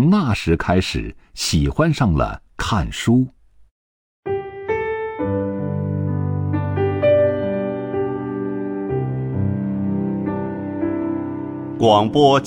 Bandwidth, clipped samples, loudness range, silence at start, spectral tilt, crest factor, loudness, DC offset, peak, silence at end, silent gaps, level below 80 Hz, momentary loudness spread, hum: 17 kHz; under 0.1%; 4 LU; 0 s; -6.5 dB/octave; 18 dB; -20 LUFS; under 0.1%; -2 dBFS; 0 s; 3.71-4.23 s; -36 dBFS; 10 LU; none